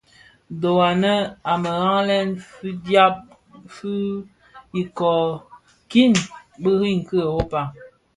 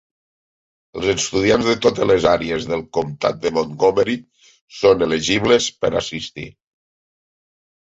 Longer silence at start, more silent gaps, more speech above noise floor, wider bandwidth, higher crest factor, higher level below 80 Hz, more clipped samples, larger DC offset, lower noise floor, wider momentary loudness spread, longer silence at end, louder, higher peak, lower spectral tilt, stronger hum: second, 0.5 s vs 0.95 s; second, none vs 4.61-4.68 s; second, 33 dB vs over 72 dB; first, 11.5 kHz vs 8 kHz; about the same, 18 dB vs 18 dB; about the same, -48 dBFS vs -46 dBFS; neither; neither; second, -53 dBFS vs under -90 dBFS; first, 16 LU vs 12 LU; second, 0.3 s vs 1.35 s; about the same, -20 LUFS vs -18 LUFS; about the same, -2 dBFS vs -2 dBFS; first, -5.5 dB/octave vs -4 dB/octave; neither